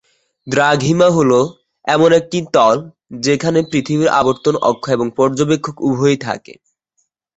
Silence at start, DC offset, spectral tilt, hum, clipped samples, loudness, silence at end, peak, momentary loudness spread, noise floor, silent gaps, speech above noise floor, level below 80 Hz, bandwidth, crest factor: 0.45 s; under 0.1%; -5.5 dB/octave; none; under 0.1%; -15 LUFS; 1 s; -2 dBFS; 8 LU; -67 dBFS; none; 53 dB; -52 dBFS; 8.2 kHz; 14 dB